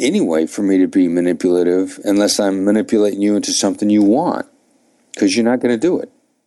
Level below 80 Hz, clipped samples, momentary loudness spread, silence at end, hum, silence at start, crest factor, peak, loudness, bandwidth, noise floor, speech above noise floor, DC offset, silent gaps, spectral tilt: -62 dBFS; under 0.1%; 6 LU; 0.4 s; none; 0 s; 12 dB; -4 dBFS; -15 LUFS; 12.5 kHz; -57 dBFS; 42 dB; under 0.1%; none; -4.5 dB/octave